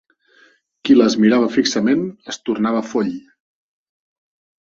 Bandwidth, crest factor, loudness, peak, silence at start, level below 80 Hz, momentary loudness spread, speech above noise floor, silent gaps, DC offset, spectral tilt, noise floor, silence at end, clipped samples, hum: 7.6 kHz; 18 dB; -17 LUFS; -2 dBFS; 0.85 s; -62 dBFS; 14 LU; 38 dB; none; under 0.1%; -5 dB/octave; -54 dBFS; 1.5 s; under 0.1%; none